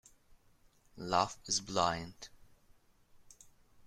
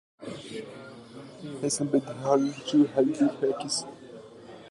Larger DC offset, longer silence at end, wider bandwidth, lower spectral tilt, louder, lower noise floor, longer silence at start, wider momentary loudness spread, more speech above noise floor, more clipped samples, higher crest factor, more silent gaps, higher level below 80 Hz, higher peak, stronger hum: neither; about the same, 0 s vs 0 s; first, 15.5 kHz vs 11.5 kHz; second, -2.5 dB/octave vs -4.5 dB/octave; second, -34 LUFS vs -27 LUFS; first, -67 dBFS vs -47 dBFS; first, 0.95 s vs 0.2 s; second, 19 LU vs 22 LU; first, 32 dB vs 21 dB; neither; first, 26 dB vs 20 dB; neither; about the same, -66 dBFS vs -70 dBFS; second, -14 dBFS vs -10 dBFS; neither